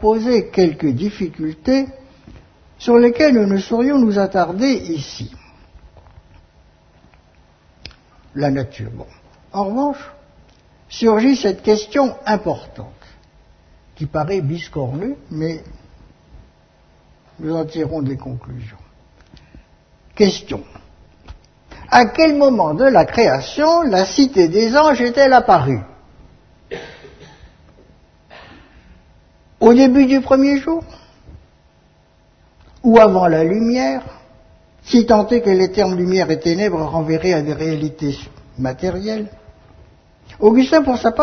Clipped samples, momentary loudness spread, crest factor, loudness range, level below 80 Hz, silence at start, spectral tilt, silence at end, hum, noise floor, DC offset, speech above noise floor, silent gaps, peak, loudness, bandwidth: under 0.1%; 19 LU; 18 dB; 13 LU; -44 dBFS; 0 s; -6 dB/octave; 0 s; none; -53 dBFS; under 0.1%; 38 dB; none; 0 dBFS; -15 LUFS; 6.6 kHz